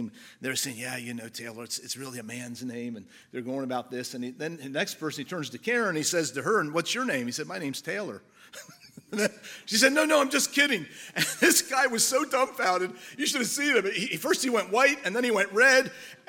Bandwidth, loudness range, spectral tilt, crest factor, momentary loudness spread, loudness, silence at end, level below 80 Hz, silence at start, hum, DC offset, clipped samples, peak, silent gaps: 17 kHz; 11 LU; -2 dB/octave; 22 dB; 16 LU; -26 LUFS; 0.15 s; -80 dBFS; 0 s; none; under 0.1%; under 0.1%; -6 dBFS; none